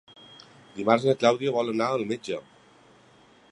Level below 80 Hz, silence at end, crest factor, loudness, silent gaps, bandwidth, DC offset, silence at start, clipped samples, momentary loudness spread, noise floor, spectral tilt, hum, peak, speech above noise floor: -72 dBFS; 1.1 s; 24 dB; -25 LUFS; none; 11 kHz; under 0.1%; 0.3 s; under 0.1%; 13 LU; -56 dBFS; -5.5 dB/octave; none; -4 dBFS; 32 dB